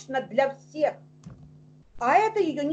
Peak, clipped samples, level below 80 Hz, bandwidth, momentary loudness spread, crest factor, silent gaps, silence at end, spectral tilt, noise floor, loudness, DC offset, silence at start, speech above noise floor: -8 dBFS; under 0.1%; -60 dBFS; 8.4 kHz; 8 LU; 18 dB; none; 0 s; -5.5 dB/octave; -52 dBFS; -25 LUFS; under 0.1%; 0 s; 27 dB